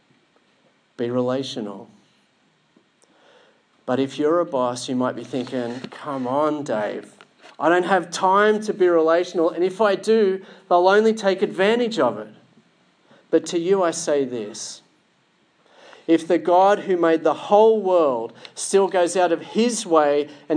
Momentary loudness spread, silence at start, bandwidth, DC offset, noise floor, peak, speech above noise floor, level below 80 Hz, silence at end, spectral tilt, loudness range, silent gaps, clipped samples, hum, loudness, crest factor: 14 LU; 1 s; 10.5 kHz; under 0.1%; -62 dBFS; -2 dBFS; 43 dB; -82 dBFS; 0 s; -4.5 dB/octave; 8 LU; none; under 0.1%; none; -20 LUFS; 18 dB